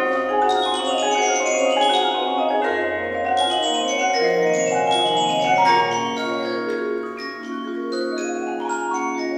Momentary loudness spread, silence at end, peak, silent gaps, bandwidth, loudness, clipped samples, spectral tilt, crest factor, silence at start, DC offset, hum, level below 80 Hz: 9 LU; 0 s; -6 dBFS; none; 13 kHz; -20 LUFS; under 0.1%; -2.5 dB/octave; 14 dB; 0 s; under 0.1%; none; -62 dBFS